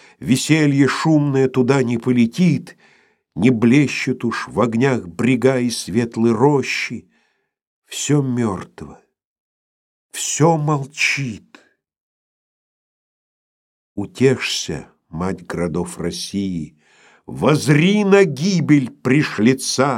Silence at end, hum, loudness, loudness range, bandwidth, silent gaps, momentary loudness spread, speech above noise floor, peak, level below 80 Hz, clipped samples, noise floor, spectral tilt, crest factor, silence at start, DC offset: 0 s; none; -17 LUFS; 8 LU; 16 kHz; 7.67-7.82 s, 9.24-10.09 s, 12.00-13.96 s; 15 LU; 49 dB; -2 dBFS; -54 dBFS; under 0.1%; -66 dBFS; -5.5 dB/octave; 18 dB; 0.2 s; under 0.1%